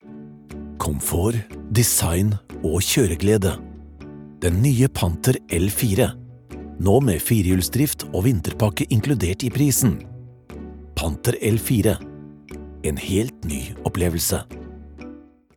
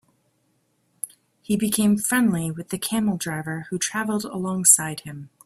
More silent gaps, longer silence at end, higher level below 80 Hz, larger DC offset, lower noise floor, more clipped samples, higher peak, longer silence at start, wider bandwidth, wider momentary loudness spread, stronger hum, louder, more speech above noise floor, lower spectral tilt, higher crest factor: neither; first, 0.35 s vs 0.2 s; first, -40 dBFS vs -60 dBFS; neither; second, -43 dBFS vs -68 dBFS; neither; about the same, -2 dBFS vs 0 dBFS; second, 0.05 s vs 1.05 s; first, 19 kHz vs 16 kHz; about the same, 21 LU vs 19 LU; neither; about the same, -21 LUFS vs -22 LUFS; second, 23 dB vs 45 dB; first, -5 dB/octave vs -3.5 dB/octave; second, 18 dB vs 24 dB